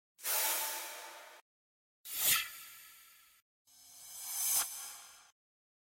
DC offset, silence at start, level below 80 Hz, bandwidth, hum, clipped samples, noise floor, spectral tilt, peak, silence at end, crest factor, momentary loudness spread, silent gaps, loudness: under 0.1%; 0.2 s; -78 dBFS; 16.5 kHz; none; under 0.1%; -61 dBFS; 2 dB/octave; -16 dBFS; 0.65 s; 24 dB; 24 LU; 1.41-2.04 s, 3.42-3.65 s; -33 LUFS